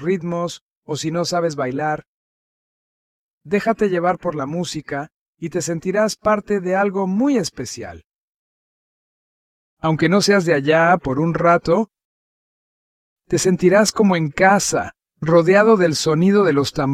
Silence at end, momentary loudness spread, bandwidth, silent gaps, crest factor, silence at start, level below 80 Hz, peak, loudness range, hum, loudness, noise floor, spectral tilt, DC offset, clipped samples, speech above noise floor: 0 s; 14 LU; 15.5 kHz; 0.61-0.83 s, 2.07-3.41 s, 5.14-5.33 s, 8.06-9.77 s, 12.05-13.16 s; 18 dB; 0 s; -52 dBFS; -2 dBFS; 8 LU; none; -18 LUFS; under -90 dBFS; -5 dB/octave; under 0.1%; under 0.1%; over 73 dB